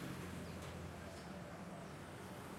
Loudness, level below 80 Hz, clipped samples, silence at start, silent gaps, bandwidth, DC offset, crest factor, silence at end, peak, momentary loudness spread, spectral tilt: -50 LUFS; -68 dBFS; under 0.1%; 0 s; none; 16 kHz; under 0.1%; 14 dB; 0 s; -36 dBFS; 3 LU; -5.5 dB/octave